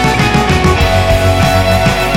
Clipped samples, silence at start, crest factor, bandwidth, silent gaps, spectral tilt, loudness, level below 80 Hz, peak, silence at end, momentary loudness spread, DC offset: under 0.1%; 0 s; 10 dB; 17 kHz; none; -5 dB/octave; -10 LUFS; -20 dBFS; 0 dBFS; 0 s; 1 LU; 2%